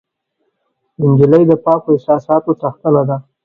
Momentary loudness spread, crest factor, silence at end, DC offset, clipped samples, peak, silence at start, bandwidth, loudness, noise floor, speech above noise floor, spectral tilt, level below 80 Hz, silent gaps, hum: 8 LU; 14 dB; 0.25 s; under 0.1%; under 0.1%; 0 dBFS; 1 s; 4.6 kHz; -13 LUFS; -68 dBFS; 56 dB; -11.5 dB/octave; -56 dBFS; none; none